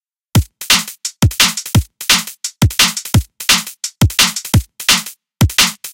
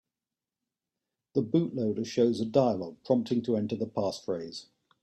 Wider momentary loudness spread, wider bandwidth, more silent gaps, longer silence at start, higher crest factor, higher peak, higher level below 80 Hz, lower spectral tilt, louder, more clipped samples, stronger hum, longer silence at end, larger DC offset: second, 6 LU vs 9 LU; first, 17.5 kHz vs 11.5 kHz; neither; second, 0.35 s vs 1.35 s; about the same, 16 dB vs 20 dB; first, 0 dBFS vs -10 dBFS; first, -28 dBFS vs -70 dBFS; second, -2.5 dB/octave vs -7 dB/octave; first, -13 LUFS vs -29 LUFS; neither; neither; second, 0 s vs 0.4 s; neither